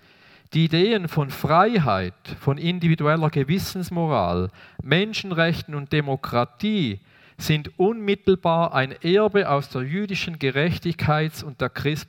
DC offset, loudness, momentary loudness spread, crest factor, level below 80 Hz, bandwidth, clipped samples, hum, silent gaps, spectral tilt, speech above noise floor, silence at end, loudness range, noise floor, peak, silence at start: under 0.1%; -22 LUFS; 8 LU; 20 dB; -54 dBFS; 17.5 kHz; under 0.1%; none; none; -6.5 dB/octave; 31 dB; 0.05 s; 3 LU; -53 dBFS; -2 dBFS; 0.5 s